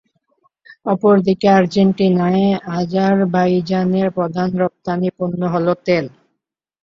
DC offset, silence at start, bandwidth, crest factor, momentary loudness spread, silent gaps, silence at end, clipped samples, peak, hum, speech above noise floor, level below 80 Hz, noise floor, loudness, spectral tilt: under 0.1%; 0.85 s; 7.2 kHz; 14 dB; 8 LU; none; 0.75 s; under 0.1%; -2 dBFS; none; 62 dB; -56 dBFS; -78 dBFS; -16 LUFS; -8 dB/octave